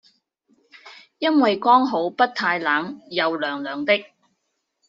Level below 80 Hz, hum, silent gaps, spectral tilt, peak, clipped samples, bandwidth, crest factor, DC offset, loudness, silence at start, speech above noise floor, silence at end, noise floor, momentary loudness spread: -72 dBFS; none; none; -1.5 dB/octave; -4 dBFS; under 0.1%; 7.6 kHz; 20 dB; under 0.1%; -21 LUFS; 0.85 s; 55 dB; 0.85 s; -75 dBFS; 9 LU